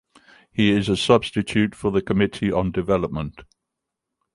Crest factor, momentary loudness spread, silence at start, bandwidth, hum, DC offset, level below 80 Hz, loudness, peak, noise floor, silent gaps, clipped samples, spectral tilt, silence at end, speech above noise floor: 20 dB; 10 LU; 0.55 s; 11.5 kHz; none; under 0.1%; -44 dBFS; -21 LUFS; -2 dBFS; -83 dBFS; none; under 0.1%; -6 dB/octave; 0.9 s; 62 dB